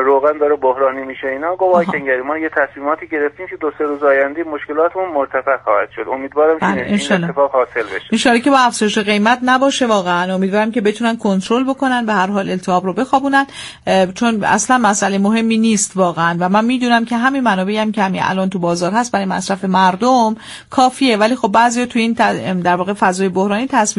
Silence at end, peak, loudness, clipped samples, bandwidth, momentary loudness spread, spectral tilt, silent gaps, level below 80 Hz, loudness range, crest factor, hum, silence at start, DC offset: 0.05 s; 0 dBFS; -15 LUFS; under 0.1%; 11.5 kHz; 6 LU; -4.5 dB/octave; none; -54 dBFS; 3 LU; 14 dB; none; 0 s; under 0.1%